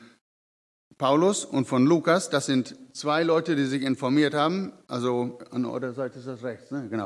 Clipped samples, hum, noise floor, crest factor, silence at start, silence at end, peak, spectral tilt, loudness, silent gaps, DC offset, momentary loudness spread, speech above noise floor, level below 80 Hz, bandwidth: under 0.1%; none; under -90 dBFS; 18 dB; 0 s; 0 s; -8 dBFS; -5 dB/octave; -25 LUFS; 0.21-0.91 s; under 0.1%; 12 LU; over 65 dB; -78 dBFS; 12 kHz